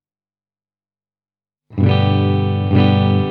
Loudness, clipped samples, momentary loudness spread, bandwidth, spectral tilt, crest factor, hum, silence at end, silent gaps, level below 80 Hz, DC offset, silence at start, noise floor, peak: -15 LUFS; under 0.1%; 5 LU; 4.6 kHz; -10 dB/octave; 16 dB; none; 0 s; none; -50 dBFS; under 0.1%; 1.7 s; under -90 dBFS; -2 dBFS